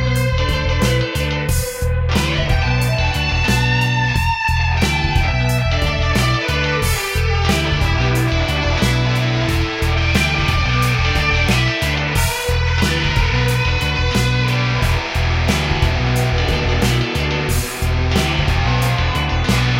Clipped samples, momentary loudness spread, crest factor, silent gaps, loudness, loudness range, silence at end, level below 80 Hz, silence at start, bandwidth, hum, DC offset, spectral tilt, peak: under 0.1%; 3 LU; 14 dB; none; -17 LUFS; 1 LU; 0 s; -22 dBFS; 0 s; 16.5 kHz; none; under 0.1%; -5 dB/octave; -2 dBFS